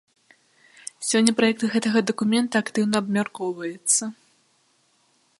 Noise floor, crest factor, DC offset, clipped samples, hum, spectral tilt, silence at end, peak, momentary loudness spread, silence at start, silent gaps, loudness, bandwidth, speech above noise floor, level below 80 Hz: -65 dBFS; 24 dB; under 0.1%; under 0.1%; none; -3.5 dB/octave; 1.25 s; 0 dBFS; 10 LU; 1 s; none; -22 LUFS; 11.5 kHz; 42 dB; -70 dBFS